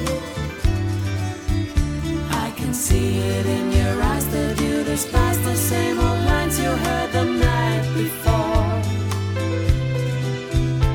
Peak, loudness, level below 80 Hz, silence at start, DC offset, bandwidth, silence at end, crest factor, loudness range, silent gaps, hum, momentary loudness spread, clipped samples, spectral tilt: -4 dBFS; -21 LUFS; -26 dBFS; 0 s; under 0.1%; 18 kHz; 0 s; 16 dB; 2 LU; none; none; 5 LU; under 0.1%; -5.5 dB/octave